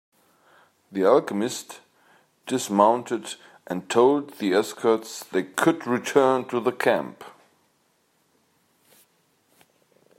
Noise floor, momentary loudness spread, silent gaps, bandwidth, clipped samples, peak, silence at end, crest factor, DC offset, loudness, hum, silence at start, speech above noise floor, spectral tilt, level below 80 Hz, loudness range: -67 dBFS; 17 LU; none; 16 kHz; under 0.1%; -4 dBFS; 2.9 s; 22 dB; under 0.1%; -23 LUFS; none; 0.9 s; 44 dB; -4.5 dB/octave; -78 dBFS; 5 LU